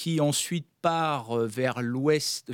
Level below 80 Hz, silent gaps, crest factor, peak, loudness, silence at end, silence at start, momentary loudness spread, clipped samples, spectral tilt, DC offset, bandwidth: -76 dBFS; none; 16 dB; -10 dBFS; -27 LUFS; 0 s; 0 s; 4 LU; under 0.1%; -4.5 dB/octave; under 0.1%; 18 kHz